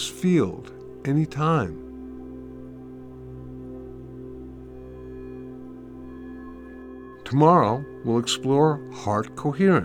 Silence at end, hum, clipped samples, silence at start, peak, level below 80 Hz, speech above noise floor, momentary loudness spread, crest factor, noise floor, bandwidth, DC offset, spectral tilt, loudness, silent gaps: 0 s; none; under 0.1%; 0 s; -4 dBFS; -50 dBFS; 19 dB; 21 LU; 22 dB; -41 dBFS; 14.5 kHz; under 0.1%; -6 dB/octave; -23 LUFS; none